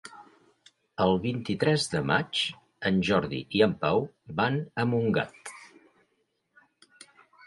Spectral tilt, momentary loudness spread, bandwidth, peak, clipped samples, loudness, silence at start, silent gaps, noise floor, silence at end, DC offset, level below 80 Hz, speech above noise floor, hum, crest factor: -5.5 dB/octave; 12 LU; 11.5 kHz; -8 dBFS; under 0.1%; -27 LUFS; 0.05 s; none; -75 dBFS; 1.8 s; under 0.1%; -58 dBFS; 48 dB; none; 20 dB